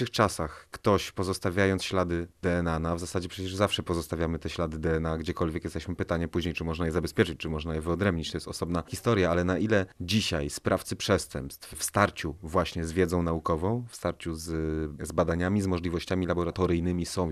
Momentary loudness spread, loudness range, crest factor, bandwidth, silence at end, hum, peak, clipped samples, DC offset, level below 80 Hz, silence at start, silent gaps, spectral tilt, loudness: 7 LU; 2 LU; 24 dB; 14 kHz; 0 s; none; -6 dBFS; under 0.1%; under 0.1%; -48 dBFS; 0 s; none; -5.5 dB/octave; -29 LUFS